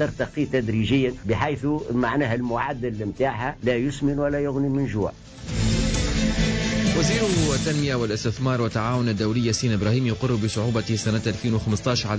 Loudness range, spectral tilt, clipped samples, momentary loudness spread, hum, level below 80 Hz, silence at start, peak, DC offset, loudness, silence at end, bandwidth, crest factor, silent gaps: 2 LU; -5.5 dB/octave; under 0.1%; 5 LU; none; -36 dBFS; 0 s; -10 dBFS; under 0.1%; -24 LUFS; 0 s; 8 kHz; 12 dB; none